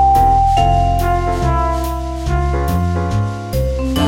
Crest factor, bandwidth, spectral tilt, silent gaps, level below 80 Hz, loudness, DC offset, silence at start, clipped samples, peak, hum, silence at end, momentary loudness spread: 14 dB; 17 kHz; -6.5 dB/octave; none; -20 dBFS; -16 LUFS; under 0.1%; 0 s; under 0.1%; -2 dBFS; none; 0 s; 8 LU